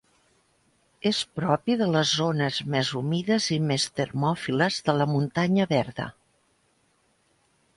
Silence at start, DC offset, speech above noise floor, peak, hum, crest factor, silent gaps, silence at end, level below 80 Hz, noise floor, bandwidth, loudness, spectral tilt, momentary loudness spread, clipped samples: 1.05 s; under 0.1%; 43 dB; -8 dBFS; none; 20 dB; none; 1.65 s; -62 dBFS; -67 dBFS; 11.5 kHz; -25 LUFS; -5 dB/octave; 5 LU; under 0.1%